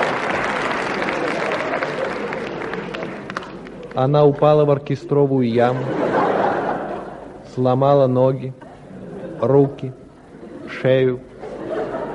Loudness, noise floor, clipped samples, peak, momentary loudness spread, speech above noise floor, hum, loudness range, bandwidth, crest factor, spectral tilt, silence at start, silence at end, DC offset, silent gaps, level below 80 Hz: -19 LUFS; -39 dBFS; under 0.1%; -2 dBFS; 18 LU; 23 dB; none; 5 LU; 11 kHz; 18 dB; -7.5 dB/octave; 0 s; 0 s; under 0.1%; none; -52 dBFS